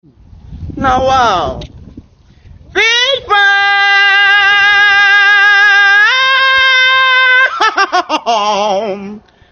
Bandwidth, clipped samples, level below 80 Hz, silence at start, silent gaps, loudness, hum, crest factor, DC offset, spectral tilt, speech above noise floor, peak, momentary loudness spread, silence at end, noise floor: 7 kHz; under 0.1%; -38 dBFS; 0.5 s; none; -8 LUFS; none; 10 dB; under 0.1%; -2 dB/octave; 29 dB; 0 dBFS; 11 LU; 0.35 s; -41 dBFS